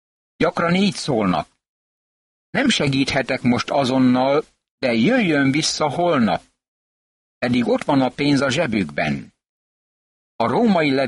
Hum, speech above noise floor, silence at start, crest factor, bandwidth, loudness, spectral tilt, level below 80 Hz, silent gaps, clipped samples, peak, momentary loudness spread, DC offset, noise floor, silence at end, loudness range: none; over 72 dB; 0.4 s; 14 dB; 11.5 kHz; -19 LUFS; -5 dB/octave; -52 dBFS; 1.68-2.53 s, 4.70-4.78 s, 6.68-7.41 s, 9.49-10.39 s; under 0.1%; -6 dBFS; 7 LU; under 0.1%; under -90 dBFS; 0 s; 3 LU